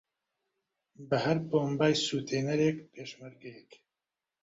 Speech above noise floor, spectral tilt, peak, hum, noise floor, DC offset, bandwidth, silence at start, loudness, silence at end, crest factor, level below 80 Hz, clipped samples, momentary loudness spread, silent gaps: over 59 dB; -5.5 dB/octave; -12 dBFS; none; under -90 dBFS; under 0.1%; 8 kHz; 1 s; -30 LUFS; 0.8 s; 20 dB; -70 dBFS; under 0.1%; 20 LU; none